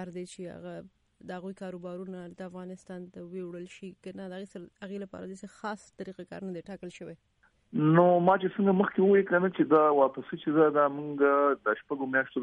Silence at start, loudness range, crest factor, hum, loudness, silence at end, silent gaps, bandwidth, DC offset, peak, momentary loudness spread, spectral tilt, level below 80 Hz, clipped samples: 0 s; 17 LU; 18 dB; none; -26 LUFS; 0 s; none; 11 kHz; under 0.1%; -10 dBFS; 21 LU; -8 dB/octave; -72 dBFS; under 0.1%